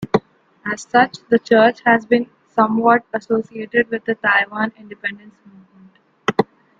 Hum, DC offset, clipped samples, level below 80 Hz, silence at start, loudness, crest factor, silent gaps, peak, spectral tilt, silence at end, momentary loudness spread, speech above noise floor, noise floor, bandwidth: none; under 0.1%; under 0.1%; -60 dBFS; 0 s; -18 LUFS; 18 dB; none; -2 dBFS; -5.5 dB/octave; 0.35 s; 13 LU; 33 dB; -50 dBFS; 7.8 kHz